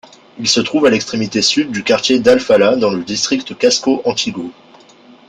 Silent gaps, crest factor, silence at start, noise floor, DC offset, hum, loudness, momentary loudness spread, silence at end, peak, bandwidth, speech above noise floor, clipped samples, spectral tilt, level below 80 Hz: none; 14 dB; 0.35 s; -43 dBFS; under 0.1%; none; -14 LUFS; 8 LU; 0.75 s; 0 dBFS; 10 kHz; 29 dB; under 0.1%; -3 dB/octave; -54 dBFS